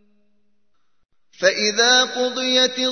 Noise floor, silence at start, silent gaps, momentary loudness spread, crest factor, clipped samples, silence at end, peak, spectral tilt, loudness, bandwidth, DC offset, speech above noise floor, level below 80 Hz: -73 dBFS; 1.4 s; none; 7 LU; 20 dB; under 0.1%; 0 s; -2 dBFS; -0.5 dB/octave; -17 LUFS; 6.6 kHz; 0.1%; 55 dB; -72 dBFS